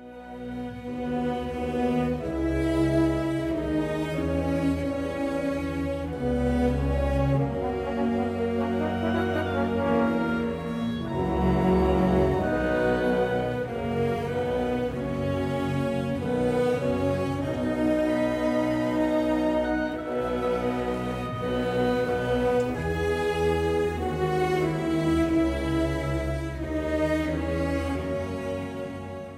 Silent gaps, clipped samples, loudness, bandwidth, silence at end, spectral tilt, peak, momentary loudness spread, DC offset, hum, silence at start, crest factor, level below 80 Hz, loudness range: none; under 0.1%; -26 LUFS; 15.5 kHz; 0 s; -7.5 dB/octave; -10 dBFS; 6 LU; under 0.1%; none; 0 s; 14 dB; -38 dBFS; 3 LU